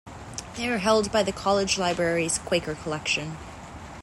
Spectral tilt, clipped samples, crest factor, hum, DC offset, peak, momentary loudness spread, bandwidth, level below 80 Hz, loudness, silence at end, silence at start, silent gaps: -3.5 dB/octave; under 0.1%; 18 dB; none; under 0.1%; -8 dBFS; 16 LU; 16 kHz; -50 dBFS; -25 LUFS; 0 s; 0.05 s; none